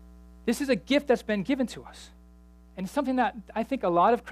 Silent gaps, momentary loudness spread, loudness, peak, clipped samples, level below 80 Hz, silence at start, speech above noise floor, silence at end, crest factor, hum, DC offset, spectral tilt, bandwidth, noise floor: none; 18 LU; -27 LUFS; -10 dBFS; under 0.1%; -54 dBFS; 0.45 s; 26 dB; 0 s; 18 dB; none; under 0.1%; -5.5 dB/octave; 15.5 kHz; -53 dBFS